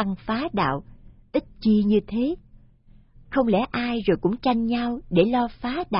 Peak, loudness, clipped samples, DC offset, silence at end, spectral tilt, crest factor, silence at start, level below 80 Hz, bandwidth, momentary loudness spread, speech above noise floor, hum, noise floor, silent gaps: -6 dBFS; -24 LUFS; under 0.1%; under 0.1%; 0 s; -11 dB/octave; 18 dB; 0 s; -46 dBFS; 5.6 kHz; 8 LU; 30 dB; none; -53 dBFS; none